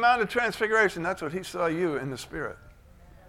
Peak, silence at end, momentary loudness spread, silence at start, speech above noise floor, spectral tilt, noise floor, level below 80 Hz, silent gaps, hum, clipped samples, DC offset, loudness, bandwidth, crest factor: -10 dBFS; 0.15 s; 12 LU; 0 s; 25 dB; -4.5 dB/octave; -52 dBFS; -54 dBFS; none; none; under 0.1%; under 0.1%; -27 LUFS; 16 kHz; 18 dB